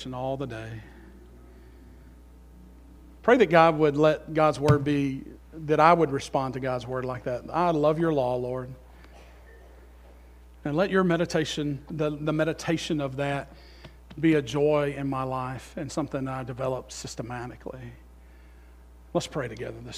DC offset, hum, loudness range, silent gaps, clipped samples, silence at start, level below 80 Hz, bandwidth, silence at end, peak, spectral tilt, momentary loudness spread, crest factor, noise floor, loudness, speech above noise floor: under 0.1%; none; 11 LU; none; under 0.1%; 0 s; -50 dBFS; 15.5 kHz; 0 s; -4 dBFS; -6.5 dB/octave; 17 LU; 24 dB; -50 dBFS; -26 LUFS; 24 dB